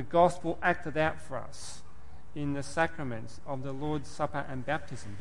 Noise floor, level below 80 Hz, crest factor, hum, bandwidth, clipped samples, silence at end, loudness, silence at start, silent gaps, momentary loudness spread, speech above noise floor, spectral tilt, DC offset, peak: -53 dBFS; -56 dBFS; 22 dB; none; 11.5 kHz; under 0.1%; 0 s; -32 LUFS; 0 s; none; 16 LU; 21 dB; -5.5 dB/octave; 2%; -12 dBFS